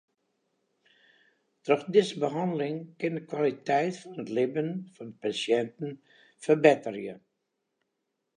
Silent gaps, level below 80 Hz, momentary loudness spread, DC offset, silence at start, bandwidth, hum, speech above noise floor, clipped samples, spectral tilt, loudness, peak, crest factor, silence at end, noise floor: none; -82 dBFS; 16 LU; under 0.1%; 1.65 s; 10 kHz; none; 54 dB; under 0.1%; -6 dB/octave; -28 LUFS; -4 dBFS; 26 dB; 1.2 s; -82 dBFS